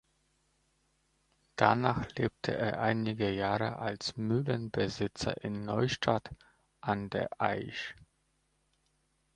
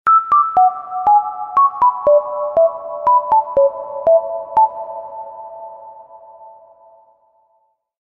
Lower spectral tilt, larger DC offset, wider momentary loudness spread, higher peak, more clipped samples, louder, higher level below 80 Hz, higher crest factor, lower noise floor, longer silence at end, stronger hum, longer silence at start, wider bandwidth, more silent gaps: about the same, -6 dB/octave vs -7 dB/octave; neither; second, 8 LU vs 19 LU; about the same, -6 dBFS vs -4 dBFS; neither; second, -33 LUFS vs -15 LUFS; about the same, -60 dBFS vs -58 dBFS; first, 28 dB vs 12 dB; first, -76 dBFS vs -63 dBFS; second, 1.35 s vs 1.55 s; neither; first, 1.55 s vs 0.05 s; first, 10.5 kHz vs 4.2 kHz; neither